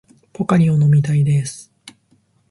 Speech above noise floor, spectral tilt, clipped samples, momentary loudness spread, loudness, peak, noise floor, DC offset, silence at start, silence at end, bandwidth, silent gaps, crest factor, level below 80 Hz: 44 dB; -7.5 dB/octave; under 0.1%; 14 LU; -16 LUFS; -4 dBFS; -59 dBFS; under 0.1%; 0.4 s; 0.6 s; 11.5 kHz; none; 14 dB; -54 dBFS